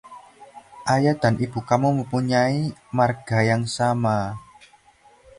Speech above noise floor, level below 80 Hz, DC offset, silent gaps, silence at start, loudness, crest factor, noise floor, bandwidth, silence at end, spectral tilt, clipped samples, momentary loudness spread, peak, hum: 34 dB; -54 dBFS; under 0.1%; none; 0.05 s; -22 LUFS; 20 dB; -55 dBFS; 11.5 kHz; 0.95 s; -6.5 dB/octave; under 0.1%; 6 LU; -4 dBFS; none